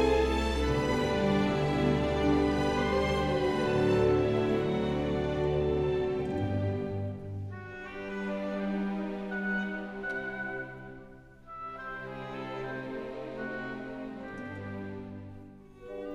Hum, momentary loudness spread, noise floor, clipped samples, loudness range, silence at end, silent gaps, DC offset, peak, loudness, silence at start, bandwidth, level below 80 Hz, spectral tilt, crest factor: none; 15 LU; -51 dBFS; under 0.1%; 12 LU; 0 s; none; under 0.1%; -14 dBFS; -31 LUFS; 0 s; 12.5 kHz; -44 dBFS; -7 dB/octave; 16 dB